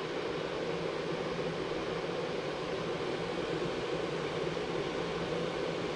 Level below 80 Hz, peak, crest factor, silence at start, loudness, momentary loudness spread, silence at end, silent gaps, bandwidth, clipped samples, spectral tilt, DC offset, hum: -58 dBFS; -22 dBFS; 14 dB; 0 s; -35 LUFS; 1 LU; 0 s; none; 11 kHz; under 0.1%; -5.5 dB/octave; under 0.1%; none